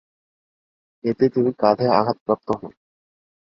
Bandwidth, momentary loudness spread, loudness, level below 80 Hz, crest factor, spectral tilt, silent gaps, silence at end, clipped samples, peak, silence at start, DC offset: 6.4 kHz; 10 LU; -21 LUFS; -60 dBFS; 20 dB; -9 dB/octave; 2.21-2.26 s; 0.7 s; under 0.1%; -2 dBFS; 1.05 s; under 0.1%